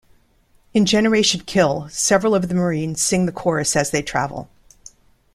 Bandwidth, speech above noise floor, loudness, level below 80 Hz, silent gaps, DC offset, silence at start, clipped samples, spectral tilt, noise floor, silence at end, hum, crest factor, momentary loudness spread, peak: 14.5 kHz; 39 dB; -18 LUFS; -48 dBFS; none; under 0.1%; 0.75 s; under 0.1%; -4 dB/octave; -57 dBFS; 0.9 s; none; 18 dB; 7 LU; -2 dBFS